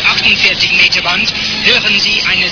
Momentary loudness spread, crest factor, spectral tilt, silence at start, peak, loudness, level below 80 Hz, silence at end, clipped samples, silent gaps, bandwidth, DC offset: 4 LU; 12 dB; -1.5 dB/octave; 0 s; 0 dBFS; -8 LUFS; -38 dBFS; 0 s; 0.3%; none; 5.4 kHz; under 0.1%